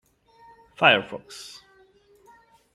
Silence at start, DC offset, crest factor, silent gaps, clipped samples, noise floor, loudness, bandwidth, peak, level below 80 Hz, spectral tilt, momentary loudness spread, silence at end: 0.8 s; under 0.1%; 26 dB; none; under 0.1%; -58 dBFS; -20 LUFS; 13.5 kHz; -2 dBFS; -70 dBFS; -3.5 dB/octave; 22 LU; 1.3 s